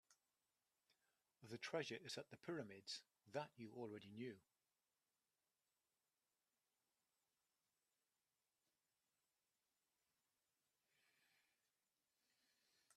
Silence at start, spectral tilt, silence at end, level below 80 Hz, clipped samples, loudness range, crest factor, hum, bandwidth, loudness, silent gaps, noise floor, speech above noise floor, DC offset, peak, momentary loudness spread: 0.1 s; -4 dB/octave; 8.55 s; under -90 dBFS; under 0.1%; 9 LU; 28 dB; none; 13 kHz; -53 LUFS; none; under -90 dBFS; over 37 dB; under 0.1%; -32 dBFS; 8 LU